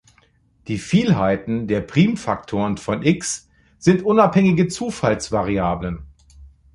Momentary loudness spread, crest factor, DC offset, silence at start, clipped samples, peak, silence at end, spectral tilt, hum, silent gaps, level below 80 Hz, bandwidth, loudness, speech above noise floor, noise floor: 12 LU; 18 dB; under 0.1%; 0.7 s; under 0.1%; -2 dBFS; 0.25 s; -6 dB/octave; none; none; -44 dBFS; 11.5 kHz; -20 LUFS; 39 dB; -58 dBFS